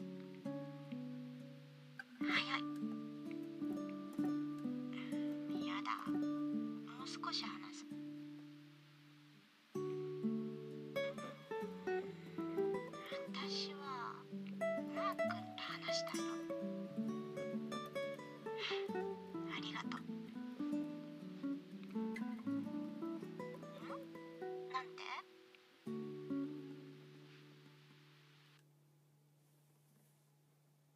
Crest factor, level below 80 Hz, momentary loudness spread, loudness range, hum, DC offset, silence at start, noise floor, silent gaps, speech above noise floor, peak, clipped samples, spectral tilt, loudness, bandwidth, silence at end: 22 dB; under -90 dBFS; 15 LU; 6 LU; none; under 0.1%; 0 s; -73 dBFS; none; 31 dB; -24 dBFS; under 0.1%; -5 dB/octave; -45 LUFS; 15 kHz; 2.35 s